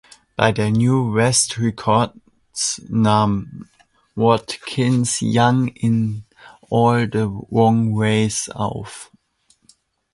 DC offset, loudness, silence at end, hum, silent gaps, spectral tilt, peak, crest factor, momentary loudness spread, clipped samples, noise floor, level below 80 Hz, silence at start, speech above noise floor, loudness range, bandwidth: under 0.1%; -18 LUFS; 1.1 s; none; none; -5 dB/octave; 0 dBFS; 18 dB; 10 LU; under 0.1%; -61 dBFS; -50 dBFS; 0.4 s; 43 dB; 2 LU; 11.5 kHz